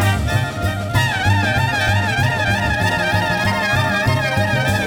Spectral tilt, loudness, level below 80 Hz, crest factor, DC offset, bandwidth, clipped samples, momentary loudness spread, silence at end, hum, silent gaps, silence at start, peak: -5 dB/octave; -17 LUFS; -34 dBFS; 14 dB; under 0.1%; over 20 kHz; under 0.1%; 3 LU; 0 s; none; none; 0 s; -4 dBFS